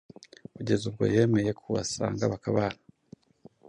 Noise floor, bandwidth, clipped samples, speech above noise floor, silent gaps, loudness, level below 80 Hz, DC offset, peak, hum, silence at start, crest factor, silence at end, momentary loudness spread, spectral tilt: -57 dBFS; 10.5 kHz; under 0.1%; 30 dB; none; -28 LUFS; -56 dBFS; under 0.1%; -10 dBFS; none; 0.6 s; 18 dB; 0.95 s; 17 LU; -6 dB/octave